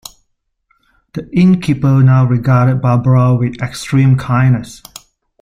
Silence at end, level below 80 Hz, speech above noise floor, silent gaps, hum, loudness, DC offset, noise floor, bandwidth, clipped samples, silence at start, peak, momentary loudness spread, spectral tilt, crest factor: 0.65 s; -42 dBFS; 54 dB; none; none; -12 LUFS; under 0.1%; -65 dBFS; 11 kHz; under 0.1%; 1.15 s; -2 dBFS; 13 LU; -8 dB/octave; 12 dB